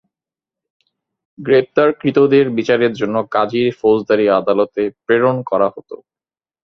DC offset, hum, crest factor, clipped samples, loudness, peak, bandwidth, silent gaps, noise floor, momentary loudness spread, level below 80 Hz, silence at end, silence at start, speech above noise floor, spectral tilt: under 0.1%; none; 16 dB; under 0.1%; -15 LUFS; 0 dBFS; 6.4 kHz; none; under -90 dBFS; 8 LU; -58 dBFS; 0.7 s; 1.4 s; over 75 dB; -7.5 dB/octave